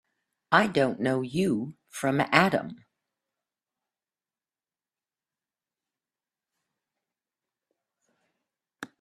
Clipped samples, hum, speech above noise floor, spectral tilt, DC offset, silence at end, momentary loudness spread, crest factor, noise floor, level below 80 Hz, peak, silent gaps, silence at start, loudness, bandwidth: under 0.1%; none; over 65 dB; -5.5 dB/octave; under 0.1%; 0.15 s; 18 LU; 30 dB; under -90 dBFS; -68 dBFS; -2 dBFS; none; 0.5 s; -25 LUFS; 14 kHz